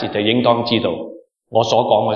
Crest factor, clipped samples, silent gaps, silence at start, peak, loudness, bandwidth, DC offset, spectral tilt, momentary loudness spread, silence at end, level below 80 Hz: 16 dB; under 0.1%; none; 0 s; 0 dBFS; -17 LUFS; 7.2 kHz; under 0.1%; -5.5 dB/octave; 10 LU; 0 s; -60 dBFS